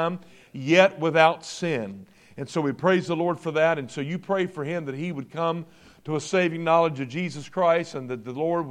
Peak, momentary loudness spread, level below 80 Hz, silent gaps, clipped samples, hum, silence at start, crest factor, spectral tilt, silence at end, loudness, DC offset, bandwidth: -4 dBFS; 14 LU; -70 dBFS; none; under 0.1%; none; 0 s; 22 dB; -5.5 dB/octave; 0 s; -25 LUFS; under 0.1%; 11.5 kHz